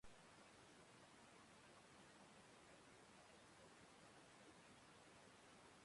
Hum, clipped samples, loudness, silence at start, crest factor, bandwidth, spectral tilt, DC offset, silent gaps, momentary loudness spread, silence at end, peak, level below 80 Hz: none; under 0.1%; -66 LUFS; 0.05 s; 16 dB; 11.5 kHz; -3 dB/octave; under 0.1%; none; 0 LU; 0 s; -50 dBFS; -86 dBFS